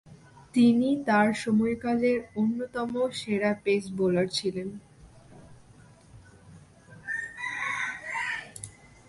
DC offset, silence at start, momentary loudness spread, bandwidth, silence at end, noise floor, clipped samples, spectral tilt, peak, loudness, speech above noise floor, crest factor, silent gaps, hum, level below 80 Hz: under 0.1%; 0.05 s; 13 LU; 11.5 kHz; 0.4 s; -54 dBFS; under 0.1%; -5.5 dB/octave; -10 dBFS; -27 LUFS; 28 dB; 18 dB; none; none; -62 dBFS